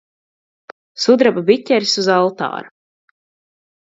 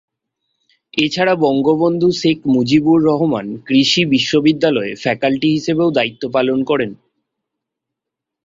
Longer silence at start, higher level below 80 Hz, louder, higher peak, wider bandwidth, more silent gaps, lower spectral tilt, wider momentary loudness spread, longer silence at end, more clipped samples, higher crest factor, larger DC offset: about the same, 0.95 s vs 0.95 s; second, -66 dBFS vs -56 dBFS; about the same, -15 LUFS vs -15 LUFS; about the same, 0 dBFS vs -2 dBFS; about the same, 7.8 kHz vs 7.6 kHz; neither; second, -4 dB/octave vs -5.5 dB/octave; first, 12 LU vs 6 LU; second, 1.2 s vs 1.5 s; neither; about the same, 18 dB vs 14 dB; neither